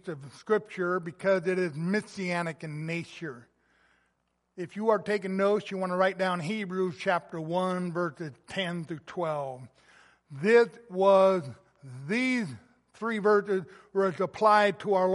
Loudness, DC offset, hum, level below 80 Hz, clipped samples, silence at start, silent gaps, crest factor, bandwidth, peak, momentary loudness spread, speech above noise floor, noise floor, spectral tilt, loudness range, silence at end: -28 LUFS; under 0.1%; none; -76 dBFS; under 0.1%; 0.05 s; none; 20 dB; 11.5 kHz; -10 dBFS; 17 LU; 48 dB; -76 dBFS; -6 dB/octave; 7 LU; 0 s